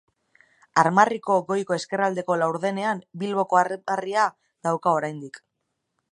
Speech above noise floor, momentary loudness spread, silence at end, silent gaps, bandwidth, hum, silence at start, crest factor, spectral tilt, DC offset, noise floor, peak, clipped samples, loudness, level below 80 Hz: 55 dB; 9 LU; 0.75 s; none; 11 kHz; none; 0.75 s; 22 dB; -5 dB/octave; under 0.1%; -78 dBFS; -2 dBFS; under 0.1%; -24 LUFS; -76 dBFS